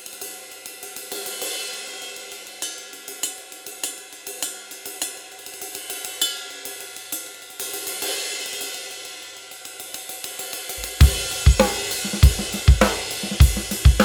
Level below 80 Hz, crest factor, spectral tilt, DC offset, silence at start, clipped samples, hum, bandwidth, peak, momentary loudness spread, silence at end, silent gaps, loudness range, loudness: -26 dBFS; 22 dB; -4 dB/octave; under 0.1%; 0 s; under 0.1%; none; over 20 kHz; 0 dBFS; 17 LU; 0 s; none; 11 LU; -24 LUFS